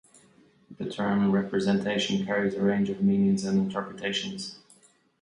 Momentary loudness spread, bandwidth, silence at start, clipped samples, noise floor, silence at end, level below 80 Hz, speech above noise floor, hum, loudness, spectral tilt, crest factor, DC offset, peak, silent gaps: 11 LU; 10.5 kHz; 0.7 s; under 0.1%; -60 dBFS; 0.65 s; -62 dBFS; 34 dB; none; -27 LUFS; -6 dB/octave; 14 dB; under 0.1%; -12 dBFS; none